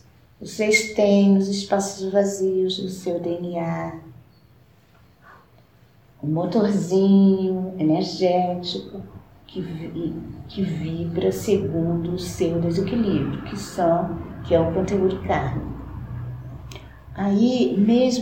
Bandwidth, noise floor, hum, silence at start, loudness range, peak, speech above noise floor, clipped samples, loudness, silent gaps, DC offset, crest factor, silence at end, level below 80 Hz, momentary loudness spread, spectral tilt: 16.5 kHz; -54 dBFS; none; 0.4 s; 7 LU; -6 dBFS; 33 dB; under 0.1%; -22 LUFS; none; 0.1%; 18 dB; 0 s; -46 dBFS; 17 LU; -6 dB/octave